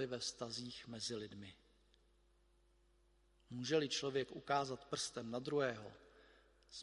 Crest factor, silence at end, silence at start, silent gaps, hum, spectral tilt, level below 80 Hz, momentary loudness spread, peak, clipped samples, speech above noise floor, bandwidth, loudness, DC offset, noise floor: 22 dB; 0 s; 0 s; none; none; -3.5 dB/octave; -74 dBFS; 15 LU; -22 dBFS; under 0.1%; 31 dB; 11.5 kHz; -42 LUFS; under 0.1%; -73 dBFS